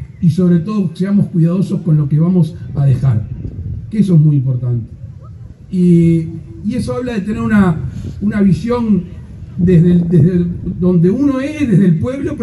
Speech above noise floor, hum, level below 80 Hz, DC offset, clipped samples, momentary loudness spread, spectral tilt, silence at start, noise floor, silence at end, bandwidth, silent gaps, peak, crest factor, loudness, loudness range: 20 dB; none; -36 dBFS; under 0.1%; under 0.1%; 14 LU; -9.5 dB/octave; 0 s; -33 dBFS; 0 s; 11 kHz; none; 0 dBFS; 12 dB; -14 LUFS; 3 LU